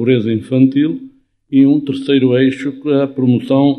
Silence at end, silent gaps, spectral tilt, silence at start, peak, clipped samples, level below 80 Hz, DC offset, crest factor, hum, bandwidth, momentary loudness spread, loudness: 0 s; none; -8.5 dB/octave; 0 s; 0 dBFS; under 0.1%; -60 dBFS; under 0.1%; 14 dB; none; 5 kHz; 5 LU; -14 LUFS